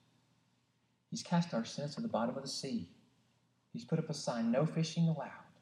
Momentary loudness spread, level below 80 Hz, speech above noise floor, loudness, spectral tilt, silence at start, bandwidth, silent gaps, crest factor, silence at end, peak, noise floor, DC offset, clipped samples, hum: 13 LU; -84 dBFS; 41 dB; -37 LUFS; -6 dB/octave; 1.1 s; 11 kHz; none; 18 dB; 0.15 s; -20 dBFS; -77 dBFS; under 0.1%; under 0.1%; none